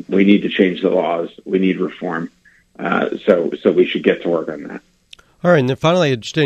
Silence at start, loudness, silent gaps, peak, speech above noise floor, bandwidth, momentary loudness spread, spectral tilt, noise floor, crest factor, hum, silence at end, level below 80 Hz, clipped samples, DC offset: 0.1 s; -17 LUFS; none; 0 dBFS; 31 dB; 8.8 kHz; 13 LU; -6.5 dB/octave; -47 dBFS; 16 dB; none; 0 s; -58 dBFS; under 0.1%; under 0.1%